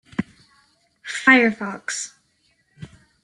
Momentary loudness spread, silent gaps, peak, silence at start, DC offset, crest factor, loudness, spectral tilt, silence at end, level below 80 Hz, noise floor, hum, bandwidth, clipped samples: 22 LU; none; -2 dBFS; 0.2 s; under 0.1%; 22 dB; -19 LUFS; -3.5 dB/octave; 0.35 s; -62 dBFS; -65 dBFS; none; 11.5 kHz; under 0.1%